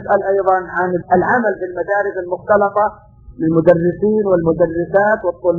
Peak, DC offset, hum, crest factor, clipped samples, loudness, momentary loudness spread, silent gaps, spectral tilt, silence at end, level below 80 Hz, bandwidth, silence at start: 0 dBFS; under 0.1%; none; 16 dB; under 0.1%; -16 LUFS; 6 LU; none; -10.5 dB/octave; 0 s; -46 dBFS; 6.6 kHz; 0 s